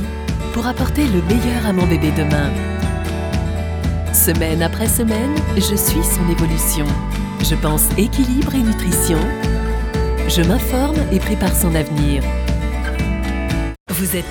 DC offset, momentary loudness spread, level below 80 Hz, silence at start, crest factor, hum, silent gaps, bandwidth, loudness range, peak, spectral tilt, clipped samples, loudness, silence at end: under 0.1%; 6 LU; -22 dBFS; 0 s; 16 dB; none; 13.80-13.86 s; over 20 kHz; 2 LU; 0 dBFS; -5 dB/octave; under 0.1%; -17 LUFS; 0 s